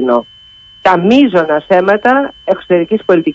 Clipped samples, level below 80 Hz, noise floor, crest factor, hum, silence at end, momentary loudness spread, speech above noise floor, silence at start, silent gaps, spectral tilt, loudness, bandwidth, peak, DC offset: under 0.1%; -50 dBFS; -39 dBFS; 12 dB; none; 0 s; 7 LU; 29 dB; 0 s; none; -7 dB/octave; -11 LUFS; 7.6 kHz; 0 dBFS; under 0.1%